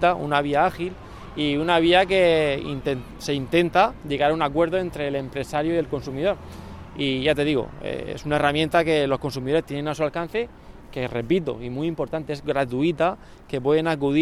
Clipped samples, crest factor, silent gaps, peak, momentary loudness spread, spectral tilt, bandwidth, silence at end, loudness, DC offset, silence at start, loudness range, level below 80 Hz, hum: under 0.1%; 18 dB; none; -6 dBFS; 12 LU; -6 dB/octave; 14.5 kHz; 0 s; -23 LUFS; under 0.1%; 0 s; 5 LU; -46 dBFS; none